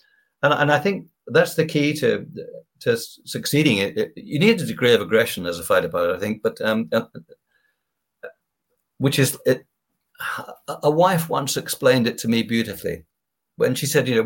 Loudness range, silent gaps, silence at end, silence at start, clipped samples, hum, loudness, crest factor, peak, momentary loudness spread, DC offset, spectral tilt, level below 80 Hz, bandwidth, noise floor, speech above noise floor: 6 LU; none; 0 s; 0.4 s; under 0.1%; none; -21 LUFS; 20 dB; -2 dBFS; 12 LU; under 0.1%; -4.5 dB/octave; -60 dBFS; 17 kHz; -78 dBFS; 58 dB